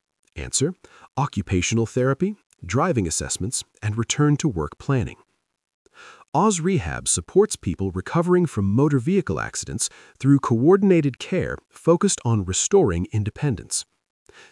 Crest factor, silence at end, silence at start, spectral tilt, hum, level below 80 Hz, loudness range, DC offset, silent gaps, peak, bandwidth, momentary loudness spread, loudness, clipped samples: 18 dB; 0.7 s; 0.35 s; -5 dB/octave; none; -48 dBFS; 4 LU; under 0.1%; 2.46-2.50 s, 5.74-5.85 s, 6.28-6.32 s; -4 dBFS; 12 kHz; 9 LU; -22 LUFS; under 0.1%